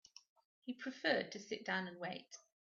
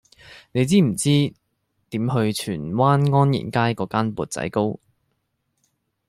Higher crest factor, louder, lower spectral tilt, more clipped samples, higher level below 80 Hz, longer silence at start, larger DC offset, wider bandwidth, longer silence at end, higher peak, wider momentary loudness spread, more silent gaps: about the same, 22 dB vs 18 dB; second, -42 LUFS vs -21 LUFS; second, -2 dB/octave vs -6 dB/octave; neither; second, -90 dBFS vs -56 dBFS; first, 0.65 s vs 0.3 s; neither; second, 7.4 kHz vs 15 kHz; second, 0.25 s vs 1.35 s; second, -22 dBFS vs -4 dBFS; first, 17 LU vs 9 LU; neither